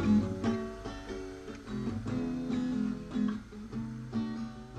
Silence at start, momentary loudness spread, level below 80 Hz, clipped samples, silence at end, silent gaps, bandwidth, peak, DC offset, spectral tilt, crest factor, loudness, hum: 0 s; 9 LU; -52 dBFS; under 0.1%; 0 s; none; 9.4 kHz; -18 dBFS; under 0.1%; -7.5 dB/octave; 16 dB; -35 LUFS; none